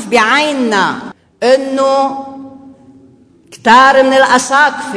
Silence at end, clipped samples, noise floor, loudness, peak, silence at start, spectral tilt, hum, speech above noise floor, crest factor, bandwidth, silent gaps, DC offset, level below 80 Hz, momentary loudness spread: 0 s; 0.3%; -44 dBFS; -10 LUFS; 0 dBFS; 0 s; -2.5 dB/octave; none; 34 dB; 12 dB; 11 kHz; none; under 0.1%; -54 dBFS; 15 LU